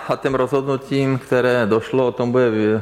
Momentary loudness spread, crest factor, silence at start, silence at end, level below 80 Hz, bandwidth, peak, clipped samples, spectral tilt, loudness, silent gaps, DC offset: 4 LU; 12 dB; 0 s; 0 s; -52 dBFS; 14 kHz; -6 dBFS; under 0.1%; -7 dB/octave; -18 LUFS; none; under 0.1%